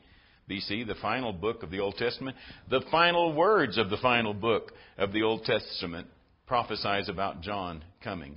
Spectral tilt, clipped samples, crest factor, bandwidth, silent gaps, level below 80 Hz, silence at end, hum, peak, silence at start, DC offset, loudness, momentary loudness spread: -9 dB/octave; under 0.1%; 22 dB; 5.6 kHz; none; -56 dBFS; 0 s; none; -8 dBFS; 0.5 s; under 0.1%; -29 LUFS; 15 LU